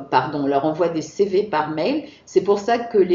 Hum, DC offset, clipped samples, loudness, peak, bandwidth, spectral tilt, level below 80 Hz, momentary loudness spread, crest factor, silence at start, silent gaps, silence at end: none; under 0.1%; under 0.1%; -21 LUFS; -2 dBFS; 7.6 kHz; -4.5 dB/octave; -62 dBFS; 4 LU; 18 dB; 0 s; none; 0 s